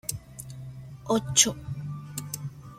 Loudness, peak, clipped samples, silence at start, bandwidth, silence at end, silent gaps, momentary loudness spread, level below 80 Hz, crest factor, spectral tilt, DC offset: -26 LUFS; -6 dBFS; under 0.1%; 0.05 s; 16.5 kHz; 0 s; none; 21 LU; -54 dBFS; 26 dB; -2.5 dB/octave; under 0.1%